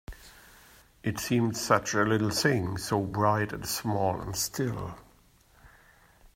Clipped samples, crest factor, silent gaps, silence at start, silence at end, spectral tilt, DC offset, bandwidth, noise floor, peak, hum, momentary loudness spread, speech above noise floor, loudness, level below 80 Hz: under 0.1%; 22 dB; none; 0.1 s; 0.7 s; -4.5 dB/octave; under 0.1%; 16 kHz; -61 dBFS; -8 dBFS; none; 12 LU; 32 dB; -28 LUFS; -54 dBFS